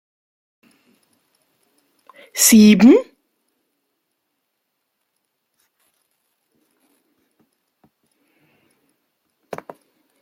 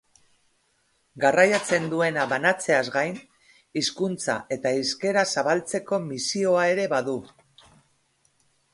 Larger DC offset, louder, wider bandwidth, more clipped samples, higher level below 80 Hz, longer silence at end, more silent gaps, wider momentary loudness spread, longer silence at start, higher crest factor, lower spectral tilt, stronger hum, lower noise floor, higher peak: neither; first, -11 LUFS vs -24 LUFS; first, 16.5 kHz vs 11.5 kHz; neither; first, -62 dBFS vs -68 dBFS; first, 7.2 s vs 1.45 s; neither; first, 27 LU vs 9 LU; first, 2.35 s vs 1.15 s; about the same, 20 dB vs 22 dB; about the same, -4 dB/octave vs -3.5 dB/octave; neither; first, -75 dBFS vs -68 dBFS; first, 0 dBFS vs -4 dBFS